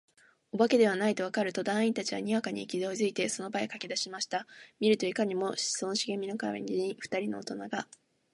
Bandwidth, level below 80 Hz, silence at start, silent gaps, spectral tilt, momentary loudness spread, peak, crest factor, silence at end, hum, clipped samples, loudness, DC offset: 11.5 kHz; -80 dBFS; 0.55 s; none; -3.5 dB/octave; 10 LU; -12 dBFS; 18 dB; 0.5 s; none; under 0.1%; -31 LUFS; under 0.1%